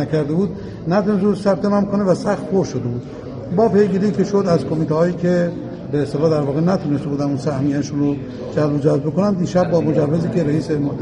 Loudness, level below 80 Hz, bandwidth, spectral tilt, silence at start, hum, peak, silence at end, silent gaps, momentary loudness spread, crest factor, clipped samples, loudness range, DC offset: -18 LUFS; -46 dBFS; 10 kHz; -8 dB/octave; 0 s; none; -4 dBFS; 0 s; none; 7 LU; 14 dB; under 0.1%; 1 LU; under 0.1%